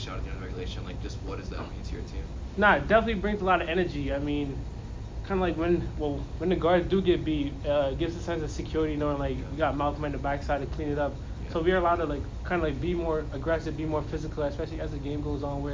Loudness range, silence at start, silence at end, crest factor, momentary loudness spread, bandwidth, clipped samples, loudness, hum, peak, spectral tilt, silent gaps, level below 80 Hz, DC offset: 3 LU; 0 s; 0 s; 20 dB; 13 LU; 7.6 kHz; under 0.1%; -29 LUFS; none; -10 dBFS; -7 dB/octave; none; -38 dBFS; under 0.1%